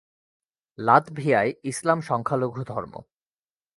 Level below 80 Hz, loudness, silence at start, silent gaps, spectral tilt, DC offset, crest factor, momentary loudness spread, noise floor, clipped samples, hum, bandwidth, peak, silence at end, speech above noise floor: -64 dBFS; -24 LUFS; 0.8 s; none; -6 dB/octave; under 0.1%; 24 dB; 13 LU; under -90 dBFS; under 0.1%; none; 11.5 kHz; -2 dBFS; 0.75 s; over 66 dB